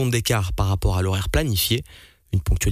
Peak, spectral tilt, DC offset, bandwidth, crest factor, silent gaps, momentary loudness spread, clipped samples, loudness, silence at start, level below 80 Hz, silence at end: -8 dBFS; -4.5 dB/octave; under 0.1%; 15.5 kHz; 14 dB; none; 5 LU; under 0.1%; -22 LUFS; 0 s; -28 dBFS; 0 s